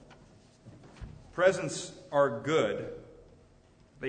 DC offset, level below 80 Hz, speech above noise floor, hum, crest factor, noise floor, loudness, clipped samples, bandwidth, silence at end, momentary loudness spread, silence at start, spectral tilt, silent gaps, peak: under 0.1%; -58 dBFS; 31 dB; none; 22 dB; -60 dBFS; -30 LUFS; under 0.1%; 9.6 kHz; 0 s; 22 LU; 0.1 s; -4.5 dB/octave; none; -12 dBFS